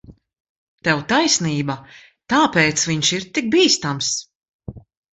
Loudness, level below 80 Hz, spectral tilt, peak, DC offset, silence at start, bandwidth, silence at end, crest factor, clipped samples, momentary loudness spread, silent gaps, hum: -18 LUFS; -54 dBFS; -3 dB/octave; -2 dBFS; under 0.1%; 0.1 s; 8.4 kHz; 0.35 s; 18 dB; under 0.1%; 13 LU; 0.40-0.78 s, 4.35-4.41 s, 4.49-4.59 s; none